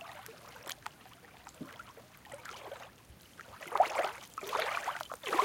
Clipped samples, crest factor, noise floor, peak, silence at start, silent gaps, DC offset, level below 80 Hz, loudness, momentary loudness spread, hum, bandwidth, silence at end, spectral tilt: under 0.1%; 24 dB; -57 dBFS; -14 dBFS; 0 s; none; under 0.1%; -70 dBFS; -37 LUFS; 22 LU; none; 17 kHz; 0 s; -2.5 dB/octave